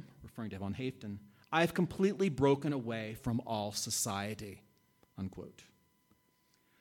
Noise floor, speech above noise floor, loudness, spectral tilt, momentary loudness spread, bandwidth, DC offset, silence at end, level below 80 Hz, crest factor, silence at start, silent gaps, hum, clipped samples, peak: -73 dBFS; 38 dB; -35 LUFS; -5 dB/octave; 16 LU; 17.5 kHz; under 0.1%; 1.15 s; -64 dBFS; 22 dB; 0 s; none; none; under 0.1%; -16 dBFS